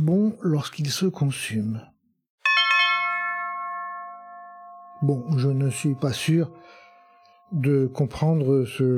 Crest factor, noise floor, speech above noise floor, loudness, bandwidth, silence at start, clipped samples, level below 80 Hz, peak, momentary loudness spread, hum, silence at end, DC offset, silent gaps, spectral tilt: 16 dB; -55 dBFS; 32 dB; -23 LUFS; 15 kHz; 0 s; under 0.1%; -60 dBFS; -8 dBFS; 17 LU; none; 0 s; under 0.1%; 2.30-2.38 s; -5.5 dB/octave